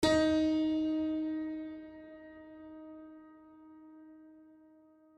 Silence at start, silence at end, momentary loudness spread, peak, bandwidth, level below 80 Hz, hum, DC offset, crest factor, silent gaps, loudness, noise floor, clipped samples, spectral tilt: 0 s; 0.9 s; 26 LU; -16 dBFS; 12 kHz; -60 dBFS; none; under 0.1%; 18 dB; none; -32 LUFS; -62 dBFS; under 0.1%; -5 dB/octave